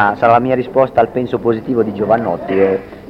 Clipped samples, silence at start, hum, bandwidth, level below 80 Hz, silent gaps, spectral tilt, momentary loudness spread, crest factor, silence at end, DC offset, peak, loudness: under 0.1%; 0 s; none; 6.2 kHz; -46 dBFS; none; -9 dB/octave; 6 LU; 14 dB; 0 s; under 0.1%; 0 dBFS; -15 LUFS